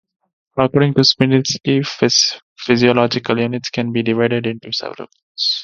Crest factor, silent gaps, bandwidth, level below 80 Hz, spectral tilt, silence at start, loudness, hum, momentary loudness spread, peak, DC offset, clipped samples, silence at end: 16 dB; 2.43-2.56 s, 5.23-5.35 s; 7.4 kHz; -54 dBFS; -4.5 dB/octave; 0.55 s; -16 LUFS; none; 11 LU; 0 dBFS; under 0.1%; under 0.1%; 0 s